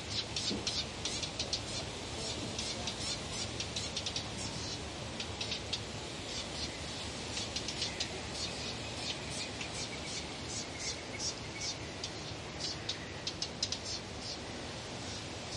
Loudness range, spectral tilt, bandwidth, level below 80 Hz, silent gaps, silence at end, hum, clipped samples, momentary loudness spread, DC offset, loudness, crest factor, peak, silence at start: 2 LU; -2.5 dB/octave; 11.5 kHz; -56 dBFS; none; 0 s; none; under 0.1%; 5 LU; under 0.1%; -38 LUFS; 20 dB; -18 dBFS; 0 s